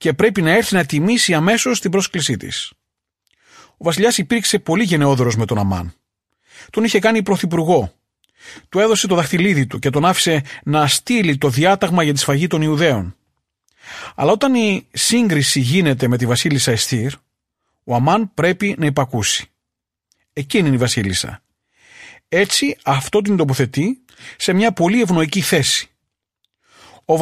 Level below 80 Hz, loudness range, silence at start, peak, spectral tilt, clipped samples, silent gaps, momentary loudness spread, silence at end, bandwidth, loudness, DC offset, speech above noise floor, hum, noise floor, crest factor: -50 dBFS; 4 LU; 0 s; -2 dBFS; -4.5 dB/octave; under 0.1%; none; 8 LU; 0 s; 15 kHz; -16 LUFS; under 0.1%; 66 dB; none; -82 dBFS; 16 dB